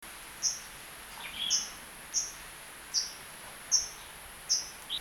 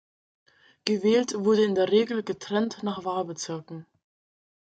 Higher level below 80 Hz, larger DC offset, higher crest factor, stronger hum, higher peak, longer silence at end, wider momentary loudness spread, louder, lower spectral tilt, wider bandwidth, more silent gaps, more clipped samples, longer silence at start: first, -62 dBFS vs -72 dBFS; neither; about the same, 24 dB vs 20 dB; neither; second, -12 dBFS vs -6 dBFS; second, 0 s vs 0.8 s; first, 16 LU vs 12 LU; second, -32 LUFS vs -26 LUFS; second, 1.5 dB/octave vs -5 dB/octave; first, over 20 kHz vs 9.2 kHz; neither; neither; second, 0 s vs 0.85 s